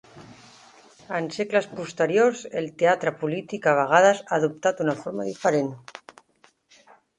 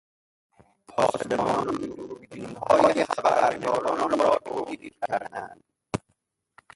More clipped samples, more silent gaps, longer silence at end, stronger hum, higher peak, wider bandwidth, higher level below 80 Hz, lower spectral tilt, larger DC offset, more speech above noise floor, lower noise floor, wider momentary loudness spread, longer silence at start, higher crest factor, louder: neither; neither; first, 1.2 s vs 0.8 s; neither; first, -2 dBFS vs -6 dBFS; about the same, 11 kHz vs 11.5 kHz; second, -70 dBFS vs -60 dBFS; about the same, -5 dB/octave vs -5 dB/octave; neither; second, 38 dB vs 49 dB; second, -61 dBFS vs -74 dBFS; second, 13 LU vs 17 LU; second, 0.15 s vs 0.9 s; about the same, 22 dB vs 22 dB; about the same, -23 LUFS vs -25 LUFS